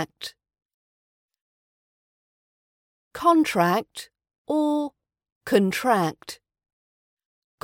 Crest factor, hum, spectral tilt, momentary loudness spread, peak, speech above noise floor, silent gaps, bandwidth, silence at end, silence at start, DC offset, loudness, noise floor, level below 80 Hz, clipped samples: 20 dB; none; -5.5 dB/octave; 20 LU; -6 dBFS; over 67 dB; 0.65-1.29 s, 1.41-3.11 s, 4.38-4.45 s, 5.32-5.41 s; 17 kHz; 1.3 s; 0 s; under 0.1%; -23 LUFS; under -90 dBFS; -68 dBFS; under 0.1%